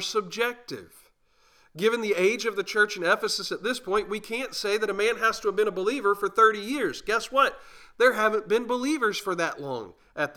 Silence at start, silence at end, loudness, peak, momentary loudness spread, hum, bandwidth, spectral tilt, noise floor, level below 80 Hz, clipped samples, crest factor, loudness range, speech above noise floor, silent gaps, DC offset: 0 s; 0.05 s; -25 LUFS; -8 dBFS; 10 LU; none; 18 kHz; -3 dB/octave; -63 dBFS; -62 dBFS; under 0.1%; 20 dB; 2 LU; 37 dB; none; under 0.1%